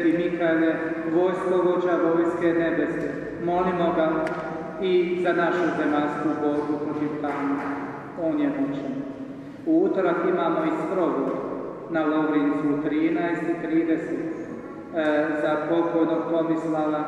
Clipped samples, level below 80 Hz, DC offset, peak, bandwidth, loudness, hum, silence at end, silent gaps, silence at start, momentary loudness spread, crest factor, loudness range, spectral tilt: under 0.1%; -60 dBFS; under 0.1%; -10 dBFS; 8.4 kHz; -24 LUFS; none; 0 s; none; 0 s; 8 LU; 14 dB; 3 LU; -7.5 dB/octave